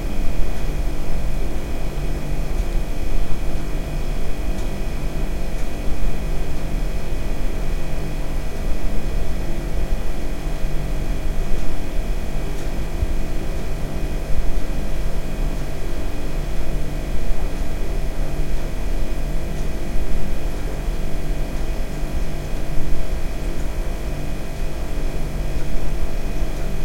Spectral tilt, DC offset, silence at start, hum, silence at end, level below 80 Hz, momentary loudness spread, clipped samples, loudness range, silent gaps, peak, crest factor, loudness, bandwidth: -6 dB/octave; under 0.1%; 0 s; none; 0 s; -22 dBFS; 2 LU; under 0.1%; 1 LU; none; -4 dBFS; 14 dB; -28 LUFS; 14.5 kHz